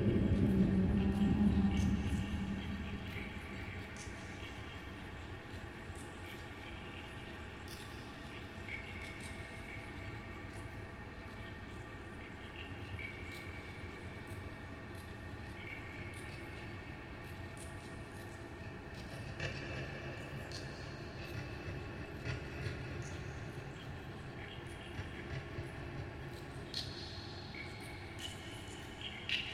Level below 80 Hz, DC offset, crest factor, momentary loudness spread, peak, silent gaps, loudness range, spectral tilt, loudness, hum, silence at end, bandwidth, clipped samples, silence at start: -50 dBFS; under 0.1%; 22 dB; 15 LU; -20 dBFS; none; 10 LU; -6 dB/octave; -42 LUFS; none; 0 s; 15.5 kHz; under 0.1%; 0 s